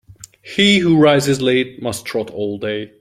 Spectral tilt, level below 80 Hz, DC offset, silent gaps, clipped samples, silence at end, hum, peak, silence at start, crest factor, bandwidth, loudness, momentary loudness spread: -5 dB/octave; -52 dBFS; under 0.1%; none; under 0.1%; 0.15 s; none; -2 dBFS; 0.45 s; 16 dB; 15.5 kHz; -16 LUFS; 12 LU